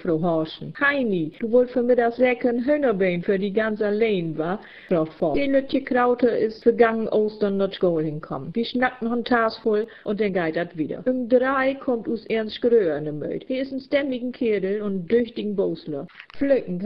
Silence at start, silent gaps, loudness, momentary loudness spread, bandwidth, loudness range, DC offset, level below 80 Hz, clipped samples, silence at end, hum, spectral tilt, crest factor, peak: 0 s; none; -23 LUFS; 8 LU; 5.6 kHz; 3 LU; 0.3%; -54 dBFS; under 0.1%; 0 s; none; -9 dB/octave; 18 dB; -4 dBFS